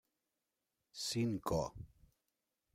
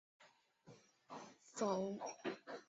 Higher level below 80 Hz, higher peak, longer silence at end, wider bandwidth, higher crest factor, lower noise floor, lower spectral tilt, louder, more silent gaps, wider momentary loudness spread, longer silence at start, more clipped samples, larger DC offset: first, -62 dBFS vs -88 dBFS; first, -22 dBFS vs -26 dBFS; first, 0.9 s vs 0.05 s; first, 16 kHz vs 8 kHz; about the same, 20 dB vs 20 dB; first, -89 dBFS vs -68 dBFS; about the same, -5 dB/octave vs -4.5 dB/octave; first, -39 LUFS vs -45 LUFS; neither; second, 19 LU vs 25 LU; first, 0.95 s vs 0.2 s; neither; neither